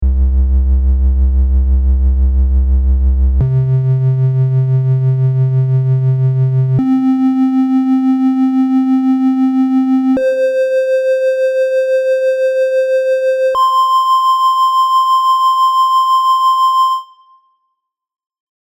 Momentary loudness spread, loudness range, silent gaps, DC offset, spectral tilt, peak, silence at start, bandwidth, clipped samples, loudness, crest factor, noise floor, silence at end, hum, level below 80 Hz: 3 LU; 2 LU; none; under 0.1%; -8 dB/octave; -4 dBFS; 0 s; 12 kHz; under 0.1%; -12 LUFS; 8 dB; -72 dBFS; 1.6 s; none; -18 dBFS